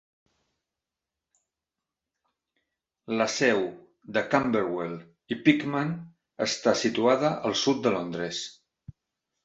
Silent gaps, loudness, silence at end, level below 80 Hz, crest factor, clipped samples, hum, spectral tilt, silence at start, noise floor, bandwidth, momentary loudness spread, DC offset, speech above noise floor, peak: none; -26 LUFS; 0.9 s; -66 dBFS; 24 dB; under 0.1%; none; -4.5 dB/octave; 3.1 s; -88 dBFS; 8.2 kHz; 12 LU; under 0.1%; 62 dB; -6 dBFS